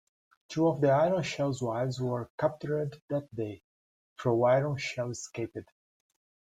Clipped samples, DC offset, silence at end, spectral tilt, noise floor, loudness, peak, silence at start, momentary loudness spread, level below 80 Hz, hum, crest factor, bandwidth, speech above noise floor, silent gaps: under 0.1%; under 0.1%; 0.9 s; -6.5 dB/octave; under -90 dBFS; -30 LUFS; -12 dBFS; 0.5 s; 13 LU; -68 dBFS; none; 18 dB; 11 kHz; over 60 dB; 2.30-2.38 s, 3.02-3.08 s, 3.64-4.16 s